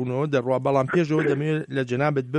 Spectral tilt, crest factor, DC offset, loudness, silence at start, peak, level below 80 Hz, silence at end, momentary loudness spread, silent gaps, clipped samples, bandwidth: -7.5 dB/octave; 16 dB; under 0.1%; -23 LUFS; 0 s; -8 dBFS; -62 dBFS; 0 s; 4 LU; none; under 0.1%; 9.6 kHz